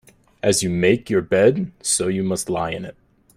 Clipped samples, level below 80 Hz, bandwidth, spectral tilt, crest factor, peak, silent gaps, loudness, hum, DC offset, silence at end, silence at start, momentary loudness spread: under 0.1%; -52 dBFS; 15.5 kHz; -4.5 dB/octave; 18 dB; -4 dBFS; none; -20 LUFS; none; under 0.1%; 0.45 s; 0.45 s; 9 LU